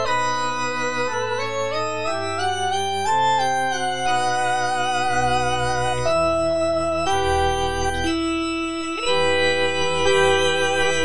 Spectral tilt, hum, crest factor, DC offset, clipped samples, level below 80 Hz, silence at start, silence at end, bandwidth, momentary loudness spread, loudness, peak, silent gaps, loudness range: -3.5 dB/octave; none; 14 dB; 3%; under 0.1%; -42 dBFS; 0 s; 0 s; 10.5 kHz; 5 LU; -21 LUFS; -6 dBFS; none; 2 LU